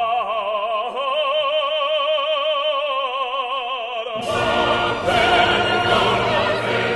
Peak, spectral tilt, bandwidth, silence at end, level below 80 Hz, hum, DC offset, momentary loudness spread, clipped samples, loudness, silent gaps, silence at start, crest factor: -4 dBFS; -4 dB/octave; 12 kHz; 0 s; -46 dBFS; none; under 0.1%; 7 LU; under 0.1%; -19 LUFS; none; 0 s; 16 dB